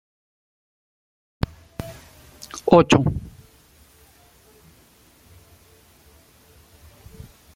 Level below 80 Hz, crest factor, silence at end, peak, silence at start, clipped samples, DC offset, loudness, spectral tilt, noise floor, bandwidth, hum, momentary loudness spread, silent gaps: -46 dBFS; 24 dB; 4.25 s; -2 dBFS; 1.8 s; under 0.1%; under 0.1%; -20 LUFS; -6 dB/octave; -54 dBFS; 16.5 kHz; none; 30 LU; none